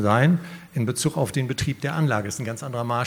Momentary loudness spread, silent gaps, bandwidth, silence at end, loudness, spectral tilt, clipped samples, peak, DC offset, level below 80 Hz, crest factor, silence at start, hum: 10 LU; none; 19.5 kHz; 0 s; -24 LUFS; -5.5 dB/octave; under 0.1%; -4 dBFS; under 0.1%; -52 dBFS; 20 dB; 0 s; none